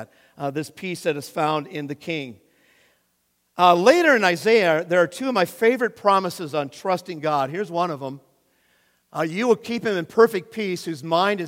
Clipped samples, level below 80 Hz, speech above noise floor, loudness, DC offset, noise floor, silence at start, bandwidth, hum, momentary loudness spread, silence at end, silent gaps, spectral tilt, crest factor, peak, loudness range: under 0.1%; -74 dBFS; 48 dB; -21 LUFS; under 0.1%; -69 dBFS; 0 s; 16.5 kHz; none; 13 LU; 0 s; none; -5 dB/octave; 22 dB; -2 dBFS; 9 LU